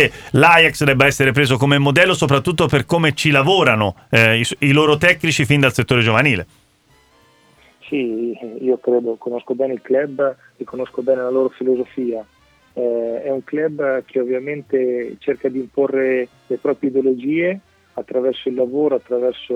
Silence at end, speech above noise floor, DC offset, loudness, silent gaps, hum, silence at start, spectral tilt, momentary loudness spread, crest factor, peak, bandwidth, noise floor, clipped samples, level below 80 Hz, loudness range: 0 s; 38 dB; under 0.1%; -17 LUFS; none; none; 0 s; -5.5 dB/octave; 11 LU; 18 dB; 0 dBFS; 16.5 kHz; -55 dBFS; under 0.1%; -48 dBFS; 8 LU